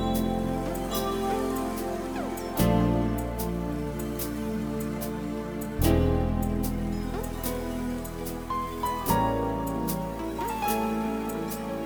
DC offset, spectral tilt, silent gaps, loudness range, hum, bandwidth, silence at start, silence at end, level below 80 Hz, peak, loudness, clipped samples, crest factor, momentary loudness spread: under 0.1%; -6 dB/octave; none; 2 LU; none; over 20 kHz; 0 s; 0 s; -38 dBFS; -8 dBFS; -29 LUFS; under 0.1%; 20 dB; 8 LU